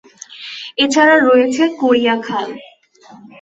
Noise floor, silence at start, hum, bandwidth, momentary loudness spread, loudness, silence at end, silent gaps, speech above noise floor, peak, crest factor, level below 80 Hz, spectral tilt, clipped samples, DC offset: -34 dBFS; 0.3 s; none; 8.2 kHz; 19 LU; -13 LUFS; 0.8 s; none; 20 dB; -2 dBFS; 14 dB; -62 dBFS; -3 dB/octave; under 0.1%; under 0.1%